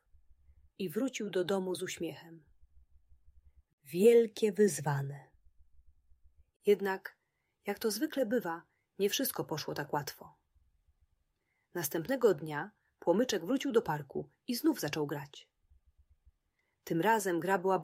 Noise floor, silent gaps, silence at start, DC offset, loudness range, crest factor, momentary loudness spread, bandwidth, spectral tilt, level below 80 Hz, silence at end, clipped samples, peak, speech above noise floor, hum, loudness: -80 dBFS; 3.73-3.78 s, 6.56-6.60 s; 0.8 s; under 0.1%; 7 LU; 20 dB; 14 LU; 16 kHz; -4.5 dB/octave; -72 dBFS; 0 s; under 0.1%; -14 dBFS; 48 dB; none; -33 LUFS